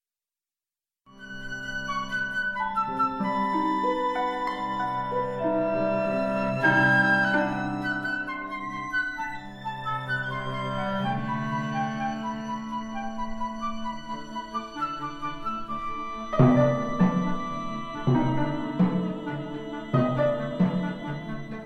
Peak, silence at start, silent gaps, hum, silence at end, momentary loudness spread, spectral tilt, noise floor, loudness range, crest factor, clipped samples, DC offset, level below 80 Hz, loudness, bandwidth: -6 dBFS; 1.1 s; none; none; 0 s; 12 LU; -7 dB/octave; under -90 dBFS; 8 LU; 22 dB; under 0.1%; under 0.1%; -48 dBFS; -27 LUFS; 11.5 kHz